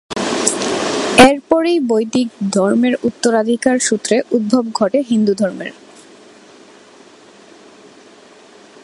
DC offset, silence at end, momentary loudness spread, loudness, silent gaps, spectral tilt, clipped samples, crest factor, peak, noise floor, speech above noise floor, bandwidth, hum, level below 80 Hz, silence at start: under 0.1%; 3.15 s; 9 LU; -15 LUFS; none; -3.5 dB/octave; 0.1%; 16 dB; 0 dBFS; -43 dBFS; 29 dB; 13.5 kHz; none; -52 dBFS; 0.1 s